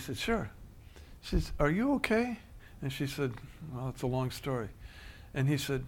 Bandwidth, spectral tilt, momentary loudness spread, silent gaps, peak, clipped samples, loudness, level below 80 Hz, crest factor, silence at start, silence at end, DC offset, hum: 18 kHz; -6 dB/octave; 21 LU; none; -12 dBFS; under 0.1%; -34 LUFS; -46 dBFS; 22 dB; 0 s; 0 s; under 0.1%; none